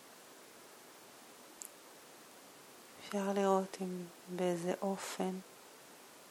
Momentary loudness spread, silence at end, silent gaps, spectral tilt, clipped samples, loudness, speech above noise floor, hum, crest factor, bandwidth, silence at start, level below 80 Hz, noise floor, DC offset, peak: 21 LU; 0 s; none; -5 dB/octave; under 0.1%; -38 LUFS; 20 dB; none; 22 dB; 18.5 kHz; 0 s; -88 dBFS; -57 dBFS; under 0.1%; -20 dBFS